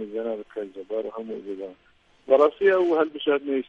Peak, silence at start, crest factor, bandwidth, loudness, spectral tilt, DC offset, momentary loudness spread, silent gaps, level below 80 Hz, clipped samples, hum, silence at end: -6 dBFS; 0 s; 20 dB; 6.8 kHz; -24 LUFS; -6 dB/octave; under 0.1%; 16 LU; none; -68 dBFS; under 0.1%; none; 0.05 s